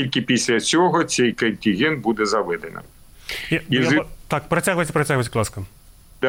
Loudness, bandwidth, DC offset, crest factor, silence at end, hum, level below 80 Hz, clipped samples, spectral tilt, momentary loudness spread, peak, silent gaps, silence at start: -20 LUFS; 17 kHz; under 0.1%; 14 dB; 0 s; none; -48 dBFS; under 0.1%; -4.5 dB/octave; 13 LU; -8 dBFS; none; 0 s